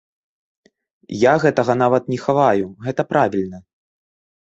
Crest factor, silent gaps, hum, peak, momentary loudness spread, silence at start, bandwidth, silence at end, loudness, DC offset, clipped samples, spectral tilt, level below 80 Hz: 18 dB; none; none; -2 dBFS; 10 LU; 1.1 s; 8.2 kHz; 0.8 s; -18 LUFS; under 0.1%; under 0.1%; -7 dB/octave; -56 dBFS